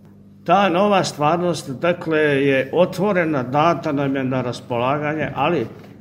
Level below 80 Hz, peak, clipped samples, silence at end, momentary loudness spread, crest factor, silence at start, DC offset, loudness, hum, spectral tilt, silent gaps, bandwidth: -56 dBFS; -2 dBFS; under 0.1%; 0.05 s; 7 LU; 18 dB; 0.45 s; under 0.1%; -19 LUFS; none; -6 dB/octave; none; 16 kHz